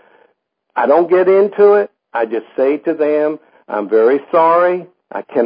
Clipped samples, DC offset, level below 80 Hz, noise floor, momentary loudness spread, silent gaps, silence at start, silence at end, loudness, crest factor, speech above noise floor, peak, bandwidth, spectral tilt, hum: under 0.1%; under 0.1%; -76 dBFS; -62 dBFS; 13 LU; none; 0.75 s; 0 s; -14 LUFS; 14 dB; 49 dB; 0 dBFS; 5.2 kHz; -11.5 dB/octave; none